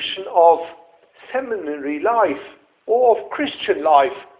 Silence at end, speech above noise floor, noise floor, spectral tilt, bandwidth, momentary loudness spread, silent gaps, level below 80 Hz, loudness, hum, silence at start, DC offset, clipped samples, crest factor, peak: 0.15 s; 29 dB; -47 dBFS; -7 dB/octave; 4 kHz; 12 LU; none; -64 dBFS; -18 LUFS; none; 0 s; under 0.1%; under 0.1%; 18 dB; 0 dBFS